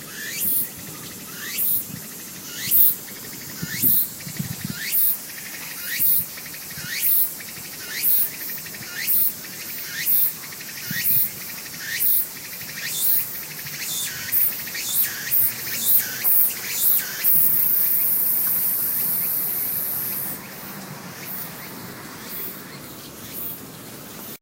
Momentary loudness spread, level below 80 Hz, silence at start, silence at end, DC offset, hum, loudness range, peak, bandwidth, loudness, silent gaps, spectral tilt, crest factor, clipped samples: 17 LU; -62 dBFS; 0 s; 0.05 s; under 0.1%; none; 9 LU; 0 dBFS; 16.5 kHz; -19 LUFS; none; -1 dB/octave; 24 dB; under 0.1%